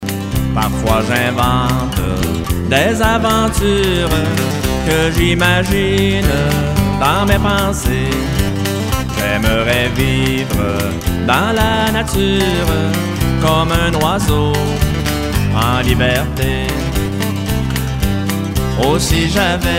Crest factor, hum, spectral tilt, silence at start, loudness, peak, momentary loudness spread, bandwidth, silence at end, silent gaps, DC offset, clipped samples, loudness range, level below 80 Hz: 14 dB; none; -5 dB/octave; 0 s; -15 LUFS; 0 dBFS; 5 LU; 16.5 kHz; 0 s; none; under 0.1%; under 0.1%; 2 LU; -24 dBFS